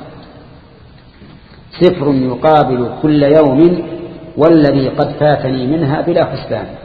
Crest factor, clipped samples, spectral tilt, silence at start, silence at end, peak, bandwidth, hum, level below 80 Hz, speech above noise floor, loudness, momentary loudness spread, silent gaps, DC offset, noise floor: 12 dB; 0.2%; -10 dB/octave; 0 s; 0 s; 0 dBFS; 5 kHz; none; -40 dBFS; 28 dB; -12 LUFS; 11 LU; none; under 0.1%; -40 dBFS